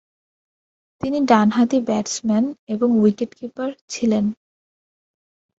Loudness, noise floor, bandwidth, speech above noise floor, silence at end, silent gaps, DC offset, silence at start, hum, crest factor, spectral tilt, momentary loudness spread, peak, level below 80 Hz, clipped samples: -20 LUFS; under -90 dBFS; 8 kHz; over 71 dB; 1.25 s; 2.59-2.67 s, 3.81-3.88 s; under 0.1%; 1.05 s; none; 18 dB; -5.5 dB/octave; 13 LU; -2 dBFS; -60 dBFS; under 0.1%